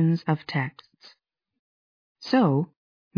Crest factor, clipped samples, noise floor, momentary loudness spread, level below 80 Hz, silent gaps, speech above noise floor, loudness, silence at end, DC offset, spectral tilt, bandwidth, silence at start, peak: 18 dB; under 0.1%; under -90 dBFS; 14 LU; -76 dBFS; 1.59-2.15 s; over 66 dB; -25 LUFS; 0.5 s; under 0.1%; -8.5 dB/octave; 5.4 kHz; 0 s; -10 dBFS